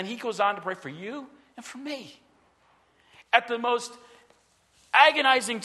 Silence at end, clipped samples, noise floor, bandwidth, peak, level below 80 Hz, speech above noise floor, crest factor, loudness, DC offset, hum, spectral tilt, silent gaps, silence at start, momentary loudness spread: 0 s; under 0.1%; -64 dBFS; 12.5 kHz; -2 dBFS; -78 dBFS; 38 dB; 26 dB; -24 LUFS; under 0.1%; none; -2 dB/octave; none; 0 s; 22 LU